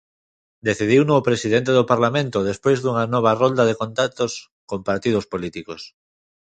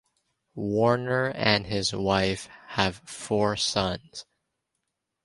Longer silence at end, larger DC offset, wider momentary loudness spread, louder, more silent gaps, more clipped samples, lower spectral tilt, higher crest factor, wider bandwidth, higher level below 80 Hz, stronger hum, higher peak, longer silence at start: second, 0.6 s vs 1.05 s; neither; about the same, 14 LU vs 14 LU; first, -20 LUFS vs -26 LUFS; first, 4.51-4.68 s vs none; neither; about the same, -5.5 dB/octave vs -4.5 dB/octave; about the same, 20 dB vs 24 dB; second, 9.2 kHz vs 11.5 kHz; about the same, -54 dBFS vs -52 dBFS; neither; about the same, -2 dBFS vs -4 dBFS; about the same, 0.65 s vs 0.55 s